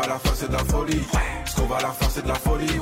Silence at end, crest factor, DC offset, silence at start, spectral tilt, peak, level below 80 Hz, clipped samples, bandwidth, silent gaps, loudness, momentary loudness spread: 0 s; 14 dB; under 0.1%; 0 s; -4.5 dB/octave; -10 dBFS; -28 dBFS; under 0.1%; 16 kHz; none; -24 LUFS; 2 LU